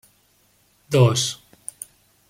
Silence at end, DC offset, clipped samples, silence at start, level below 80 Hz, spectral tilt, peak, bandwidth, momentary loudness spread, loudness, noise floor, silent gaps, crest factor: 0.95 s; under 0.1%; under 0.1%; 0.9 s; -60 dBFS; -5 dB/octave; -4 dBFS; 16 kHz; 22 LU; -19 LUFS; -61 dBFS; none; 20 dB